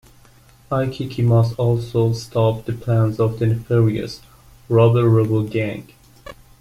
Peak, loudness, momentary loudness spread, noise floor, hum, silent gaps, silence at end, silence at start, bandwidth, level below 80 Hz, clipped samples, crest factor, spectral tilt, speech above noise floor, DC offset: -4 dBFS; -19 LUFS; 11 LU; -49 dBFS; none; none; 0.3 s; 0.7 s; 11.5 kHz; -46 dBFS; under 0.1%; 16 dB; -8.5 dB/octave; 32 dB; under 0.1%